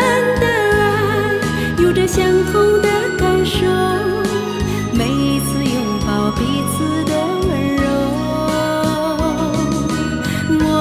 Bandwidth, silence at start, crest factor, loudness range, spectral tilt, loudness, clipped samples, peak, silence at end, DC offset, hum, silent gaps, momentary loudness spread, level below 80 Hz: 16 kHz; 0 s; 14 dB; 3 LU; -5.5 dB/octave; -16 LUFS; under 0.1%; -2 dBFS; 0 s; under 0.1%; none; none; 5 LU; -32 dBFS